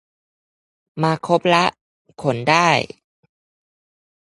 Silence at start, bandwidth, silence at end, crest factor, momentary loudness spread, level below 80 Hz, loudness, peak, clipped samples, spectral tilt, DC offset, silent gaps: 0.95 s; 11.5 kHz; 1.35 s; 22 dB; 11 LU; -62 dBFS; -18 LUFS; 0 dBFS; under 0.1%; -5 dB/octave; under 0.1%; 1.81-2.05 s